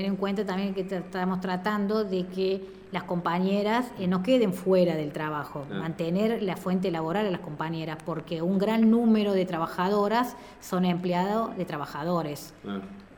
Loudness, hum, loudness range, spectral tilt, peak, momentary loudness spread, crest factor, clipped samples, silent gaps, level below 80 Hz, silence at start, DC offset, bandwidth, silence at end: -28 LUFS; none; 4 LU; -7 dB/octave; -12 dBFS; 10 LU; 16 dB; under 0.1%; none; -60 dBFS; 0 s; under 0.1%; over 20 kHz; 0 s